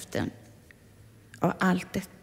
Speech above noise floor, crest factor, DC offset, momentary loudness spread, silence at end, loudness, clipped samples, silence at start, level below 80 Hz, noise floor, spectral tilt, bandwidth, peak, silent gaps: 26 dB; 22 dB; under 0.1%; 10 LU; 0.15 s; -29 LUFS; under 0.1%; 0 s; -58 dBFS; -54 dBFS; -6 dB/octave; 16 kHz; -10 dBFS; none